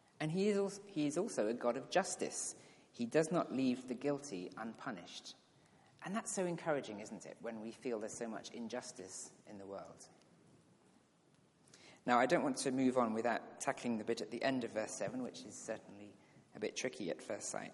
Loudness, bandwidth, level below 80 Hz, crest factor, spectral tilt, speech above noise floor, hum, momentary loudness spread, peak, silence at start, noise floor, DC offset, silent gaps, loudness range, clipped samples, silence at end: -40 LUFS; 11.5 kHz; -86 dBFS; 22 dB; -4.5 dB/octave; 31 dB; none; 15 LU; -18 dBFS; 0.2 s; -71 dBFS; under 0.1%; none; 10 LU; under 0.1%; 0 s